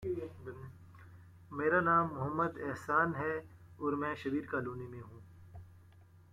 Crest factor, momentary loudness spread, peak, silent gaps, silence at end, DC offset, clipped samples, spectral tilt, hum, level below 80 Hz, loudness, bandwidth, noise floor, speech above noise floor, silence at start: 18 dB; 24 LU; -18 dBFS; none; 0.3 s; under 0.1%; under 0.1%; -8 dB/octave; none; -66 dBFS; -34 LUFS; 15 kHz; -60 dBFS; 26 dB; 0 s